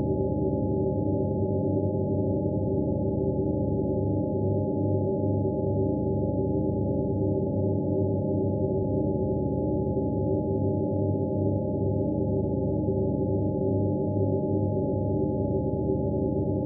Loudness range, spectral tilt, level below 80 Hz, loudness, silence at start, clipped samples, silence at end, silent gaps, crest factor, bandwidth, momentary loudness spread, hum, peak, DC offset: 0 LU; -7 dB/octave; -42 dBFS; -27 LUFS; 0 s; under 0.1%; 0 s; none; 12 dB; 0.9 kHz; 1 LU; none; -14 dBFS; under 0.1%